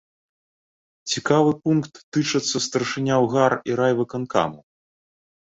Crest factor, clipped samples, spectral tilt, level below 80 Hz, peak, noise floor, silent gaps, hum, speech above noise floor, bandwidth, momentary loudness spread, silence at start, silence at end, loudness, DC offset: 20 dB; under 0.1%; -5 dB/octave; -62 dBFS; -4 dBFS; under -90 dBFS; 2.04-2.12 s; none; over 69 dB; 8.2 kHz; 8 LU; 1.05 s; 1 s; -22 LUFS; under 0.1%